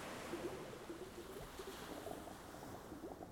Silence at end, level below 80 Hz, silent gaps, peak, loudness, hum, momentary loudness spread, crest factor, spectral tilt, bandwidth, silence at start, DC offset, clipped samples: 0 s; -66 dBFS; none; -34 dBFS; -50 LUFS; none; 6 LU; 16 dB; -4.5 dB/octave; 19 kHz; 0 s; under 0.1%; under 0.1%